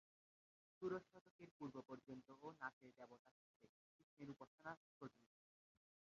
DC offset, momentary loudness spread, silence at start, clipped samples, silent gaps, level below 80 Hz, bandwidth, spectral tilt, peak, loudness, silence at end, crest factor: under 0.1%; 15 LU; 0.8 s; under 0.1%; 1.21-1.39 s, 1.51-1.60 s, 2.73-2.81 s, 3.19-3.25 s, 3.31-3.60 s, 3.69-4.17 s, 4.47-4.58 s, 4.77-5.01 s; under -90 dBFS; 7.2 kHz; -5.5 dB/octave; -36 dBFS; -57 LUFS; 0.9 s; 22 dB